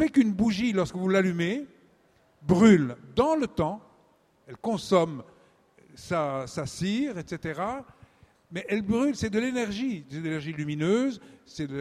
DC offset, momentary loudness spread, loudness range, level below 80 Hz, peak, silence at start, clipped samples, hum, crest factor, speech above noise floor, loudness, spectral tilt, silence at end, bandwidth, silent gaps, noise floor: under 0.1%; 14 LU; 7 LU; -56 dBFS; -6 dBFS; 0 s; under 0.1%; none; 22 dB; 37 dB; -27 LUFS; -6.5 dB/octave; 0 s; 12.5 kHz; none; -63 dBFS